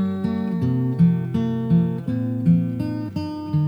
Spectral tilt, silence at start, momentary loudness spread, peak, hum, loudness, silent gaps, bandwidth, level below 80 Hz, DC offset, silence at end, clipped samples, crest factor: -10 dB/octave; 0 s; 8 LU; -8 dBFS; none; -22 LUFS; none; 5.2 kHz; -54 dBFS; under 0.1%; 0 s; under 0.1%; 14 dB